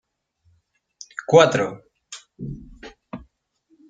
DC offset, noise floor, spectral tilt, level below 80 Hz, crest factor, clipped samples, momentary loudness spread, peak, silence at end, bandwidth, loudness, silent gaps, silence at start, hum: under 0.1%; -66 dBFS; -5 dB/octave; -52 dBFS; 22 dB; under 0.1%; 26 LU; -2 dBFS; 0.7 s; 9.2 kHz; -17 LUFS; none; 1.2 s; none